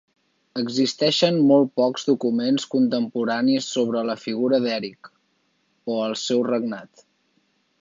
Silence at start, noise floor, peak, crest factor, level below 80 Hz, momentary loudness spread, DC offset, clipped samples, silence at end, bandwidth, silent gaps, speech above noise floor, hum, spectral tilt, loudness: 0.55 s; -68 dBFS; -4 dBFS; 18 dB; -74 dBFS; 11 LU; under 0.1%; under 0.1%; 0.95 s; 7.6 kHz; none; 47 dB; none; -5 dB/octave; -22 LUFS